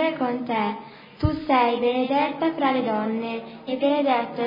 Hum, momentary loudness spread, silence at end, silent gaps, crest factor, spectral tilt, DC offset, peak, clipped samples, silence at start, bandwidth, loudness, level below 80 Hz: none; 11 LU; 0 s; none; 16 dB; -9 dB/octave; under 0.1%; -8 dBFS; under 0.1%; 0 s; 5.4 kHz; -24 LUFS; -48 dBFS